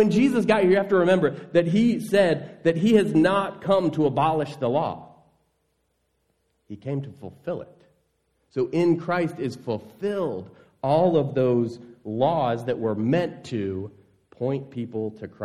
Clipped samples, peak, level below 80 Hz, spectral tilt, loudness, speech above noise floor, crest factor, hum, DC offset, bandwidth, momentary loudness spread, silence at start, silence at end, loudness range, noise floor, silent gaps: under 0.1%; -6 dBFS; -64 dBFS; -7.5 dB/octave; -23 LUFS; 49 dB; 18 dB; none; under 0.1%; 13.5 kHz; 14 LU; 0 s; 0 s; 11 LU; -72 dBFS; none